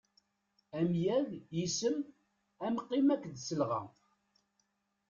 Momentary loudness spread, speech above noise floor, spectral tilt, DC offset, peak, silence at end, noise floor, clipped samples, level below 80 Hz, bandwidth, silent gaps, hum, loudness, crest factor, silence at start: 11 LU; 46 dB; -5.5 dB/octave; under 0.1%; -20 dBFS; 1.2 s; -80 dBFS; under 0.1%; -74 dBFS; 7.6 kHz; none; none; -35 LUFS; 16 dB; 0.75 s